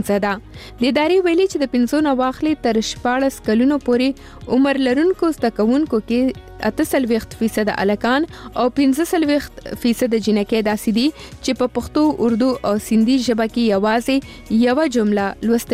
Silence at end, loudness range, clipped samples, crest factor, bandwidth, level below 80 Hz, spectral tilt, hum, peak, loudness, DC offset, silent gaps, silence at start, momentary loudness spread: 0 s; 2 LU; under 0.1%; 12 dB; 16 kHz; -44 dBFS; -5 dB/octave; none; -4 dBFS; -18 LUFS; under 0.1%; none; 0 s; 6 LU